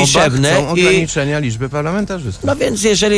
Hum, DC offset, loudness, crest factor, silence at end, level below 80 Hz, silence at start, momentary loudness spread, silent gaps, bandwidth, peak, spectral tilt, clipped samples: none; under 0.1%; -14 LUFS; 12 dB; 0 s; -36 dBFS; 0 s; 8 LU; none; 11 kHz; -2 dBFS; -4 dB/octave; under 0.1%